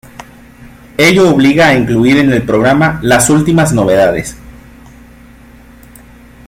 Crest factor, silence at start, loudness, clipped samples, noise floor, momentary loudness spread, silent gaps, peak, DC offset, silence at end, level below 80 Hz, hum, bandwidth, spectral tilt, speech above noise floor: 12 dB; 0.2 s; -9 LUFS; under 0.1%; -37 dBFS; 4 LU; none; 0 dBFS; under 0.1%; 1.95 s; -36 dBFS; 60 Hz at -35 dBFS; 16.5 kHz; -5 dB/octave; 29 dB